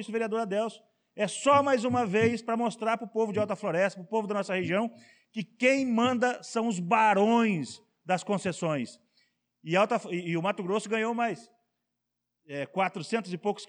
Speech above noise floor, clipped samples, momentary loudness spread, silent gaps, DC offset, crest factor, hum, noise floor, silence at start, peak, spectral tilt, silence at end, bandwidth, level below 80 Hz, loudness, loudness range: 56 dB; under 0.1%; 12 LU; none; under 0.1%; 16 dB; none; -84 dBFS; 0 s; -12 dBFS; -5 dB/octave; 0.05 s; 10.5 kHz; -76 dBFS; -28 LUFS; 4 LU